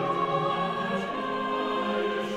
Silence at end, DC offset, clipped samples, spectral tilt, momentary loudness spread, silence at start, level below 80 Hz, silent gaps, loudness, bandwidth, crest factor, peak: 0 s; under 0.1%; under 0.1%; -6 dB/octave; 3 LU; 0 s; -64 dBFS; none; -28 LUFS; 13.5 kHz; 14 dB; -14 dBFS